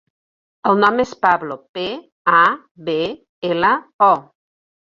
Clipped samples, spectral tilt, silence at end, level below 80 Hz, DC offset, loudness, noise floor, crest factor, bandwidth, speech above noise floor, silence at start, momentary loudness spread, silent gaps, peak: under 0.1%; -5.5 dB/octave; 0.65 s; -60 dBFS; under 0.1%; -18 LUFS; under -90 dBFS; 18 dB; 7.4 kHz; over 73 dB; 0.65 s; 12 LU; 1.69-1.74 s, 2.12-2.25 s, 2.71-2.75 s, 3.29-3.42 s, 3.94-3.99 s; -2 dBFS